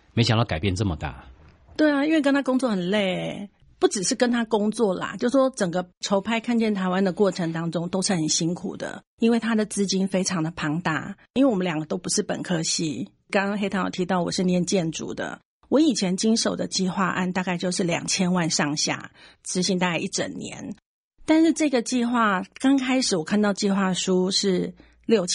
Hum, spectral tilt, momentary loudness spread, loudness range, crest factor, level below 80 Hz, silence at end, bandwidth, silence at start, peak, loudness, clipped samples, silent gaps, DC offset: none; -4.5 dB/octave; 10 LU; 3 LU; 16 dB; -54 dBFS; 0 s; 11.5 kHz; 0.15 s; -6 dBFS; -23 LUFS; under 0.1%; 5.97-6.01 s, 9.07-9.18 s, 11.30-11.34 s, 15.45-15.60 s, 20.86-21.11 s; under 0.1%